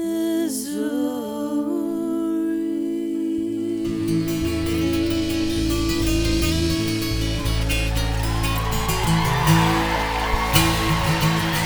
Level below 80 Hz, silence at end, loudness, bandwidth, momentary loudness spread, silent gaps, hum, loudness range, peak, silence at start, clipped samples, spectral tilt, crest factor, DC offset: -30 dBFS; 0 s; -22 LUFS; over 20 kHz; 7 LU; none; none; 4 LU; 0 dBFS; 0 s; under 0.1%; -5 dB/octave; 20 dB; under 0.1%